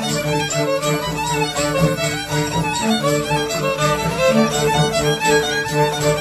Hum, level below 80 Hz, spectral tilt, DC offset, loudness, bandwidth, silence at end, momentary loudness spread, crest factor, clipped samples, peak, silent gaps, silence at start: none; -40 dBFS; -4 dB/octave; under 0.1%; -18 LUFS; 14 kHz; 0 s; 4 LU; 16 dB; under 0.1%; -4 dBFS; none; 0 s